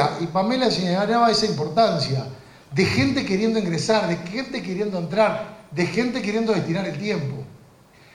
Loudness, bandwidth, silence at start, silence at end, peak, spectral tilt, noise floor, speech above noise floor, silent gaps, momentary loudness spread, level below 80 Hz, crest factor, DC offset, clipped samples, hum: -22 LUFS; 13 kHz; 0 s; 0.6 s; -4 dBFS; -5.5 dB/octave; -51 dBFS; 29 dB; none; 9 LU; -54 dBFS; 18 dB; under 0.1%; under 0.1%; none